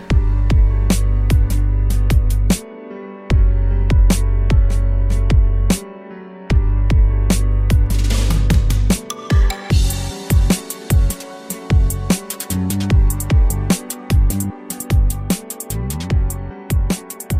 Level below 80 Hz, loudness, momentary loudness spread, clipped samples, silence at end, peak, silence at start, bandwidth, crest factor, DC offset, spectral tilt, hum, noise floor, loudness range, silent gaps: -16 dBFS; -18 LUFS; 8 LU; under 0.1%; 0 s; -4 dBFS; 0 s; 16 kHz; 12 dB; under 0.1%; -5.5 dB/octave; none; -34 dBFS; 2 LU; none